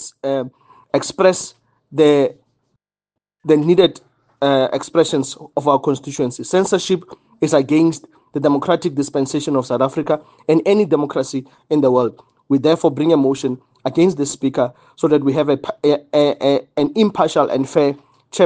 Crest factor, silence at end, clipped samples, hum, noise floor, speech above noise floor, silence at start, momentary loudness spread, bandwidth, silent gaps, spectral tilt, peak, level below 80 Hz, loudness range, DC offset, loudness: 16 dB; 0 s; under 0.1%; none; -83 dBFS; 67 dB; 0 s; 8 LU; 9.6 kHz; none; -5.5 dB/octave; 0 dBFS; -62 dBFS; 1 LU; under 0.1%; -17 LUFS